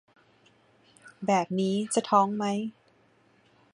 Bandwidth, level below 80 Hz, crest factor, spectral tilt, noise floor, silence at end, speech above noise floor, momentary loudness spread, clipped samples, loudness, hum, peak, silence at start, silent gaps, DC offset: 11 kHz; -74 dBFS; 20 dB; -5 dB/octave; -63 dBFS; 1.05 s; 37 dB; 10 LU; under 0.1%; -27 LUFS; none; -10 dBFS; 1.05 s; none; under 0.1%